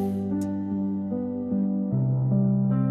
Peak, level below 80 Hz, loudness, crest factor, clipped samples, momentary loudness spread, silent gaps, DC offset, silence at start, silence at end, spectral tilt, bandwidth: -14 dBFS; -58 dBFS; -26 LUFS; 10 dB; under 0.1%; 6 LU; none; under 0.1%; 0 s; 0 s; -11 dB/octave; 7.8 kHz